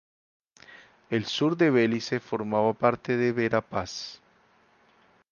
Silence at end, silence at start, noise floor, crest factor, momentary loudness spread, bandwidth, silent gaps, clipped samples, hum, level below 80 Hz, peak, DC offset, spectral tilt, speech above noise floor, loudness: 1.15 s; 0.7 s; -62 dBFS; 22 dB; 11 LU; 7.2 kHz; none; under 0.1%; none; -62 dBFS; -6 dBFS; under 0.1%; -6 dB/octave; 37 dB; -26 LUFS